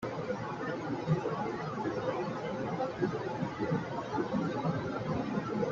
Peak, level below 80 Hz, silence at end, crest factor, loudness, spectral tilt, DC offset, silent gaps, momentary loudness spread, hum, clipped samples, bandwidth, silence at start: -18 dBFS; -62 dBFS; 0 s; 16 dB; -35 LUFS; -7.5 dB/octave; under 0.1%; none; 4 LU; none; under 0.1%; 7.6 kHz; 0 s